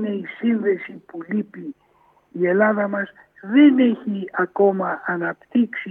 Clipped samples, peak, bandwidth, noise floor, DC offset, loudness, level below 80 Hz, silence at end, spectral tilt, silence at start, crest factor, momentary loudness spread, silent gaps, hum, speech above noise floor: under 0.1%; -4 dBFS; 3.7 kHz; -58 dBFS; under 0.1%; -20 LUFS; -74 dBFS; 0 s; -10 dB/octave; 0 s; 16 dB; 20 LU; none; none; 38 dB